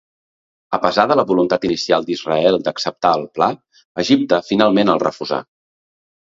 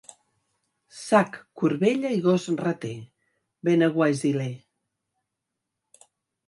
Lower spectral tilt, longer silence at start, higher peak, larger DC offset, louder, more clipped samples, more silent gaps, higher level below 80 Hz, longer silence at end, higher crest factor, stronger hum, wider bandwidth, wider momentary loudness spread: second, -5 dB/octave vs -6.5 dB/octave; second, 0.7 s vs 0.95 s; first, 0 dBFS vs -4 dBFS; neither; first, -17 LUFS vs -24 LUFS; neither; first, 3.85-3.95 s vs none; first, -56 dBFS vs -72 dBFS; second, 0.9 s vs 1.9 s; about the same, 18 dB vs 22 dB; neither; second, 7.8 kHz vs 11.5 kHz; second, 9 LU vs 14 LU